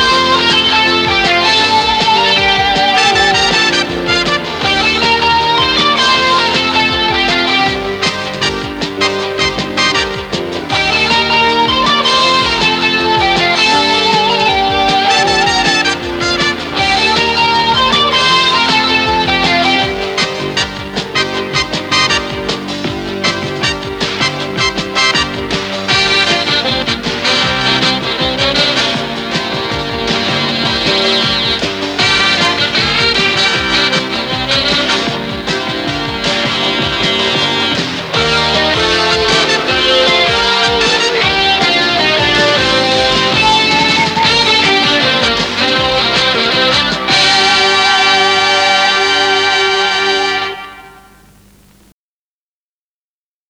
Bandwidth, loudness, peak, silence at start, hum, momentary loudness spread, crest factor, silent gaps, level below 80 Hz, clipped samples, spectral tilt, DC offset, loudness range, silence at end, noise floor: over 20 kHz; -11 LUFS; 0 dBFS; 0 s; none; 7 LU; 12 dB; none; -36 dBFS; under 0.1%; -3 dB/octave; under 0.1%; 5 LU; 2.6 s; under -90 dBFS